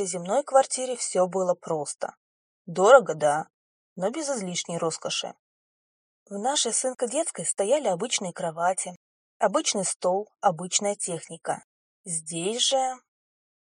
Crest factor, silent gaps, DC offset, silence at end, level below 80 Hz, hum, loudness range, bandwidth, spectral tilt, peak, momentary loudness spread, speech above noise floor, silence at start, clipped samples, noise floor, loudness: 24 dB; 2.17-2.65 s, 3.54-3.96 s, 5.39-6.26 s, 8.96-9.40 s, 9.96-10.00 s, 11.64-12.04 s; under 0.1%; 0.65 s; -84 dBFS; none; 5 LU; 11 kHz; -2.5 dB/octave; -2 dBFS; 11 LU; over 65 dB; 0 s; under 0.1%; under -90 dBFS; -25 LUFS